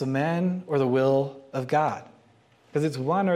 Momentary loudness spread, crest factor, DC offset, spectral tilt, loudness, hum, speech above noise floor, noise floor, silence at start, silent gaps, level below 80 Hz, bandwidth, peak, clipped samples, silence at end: 9 LU; 16 dB; under 0.1%; -7.5 dB/octave; -26 LUFS; none; 35 dB; -59 dBFS; 0 s; none; -72 dBFS; 13.5 kHz; -10 dBFS; under 0.1%; 0 s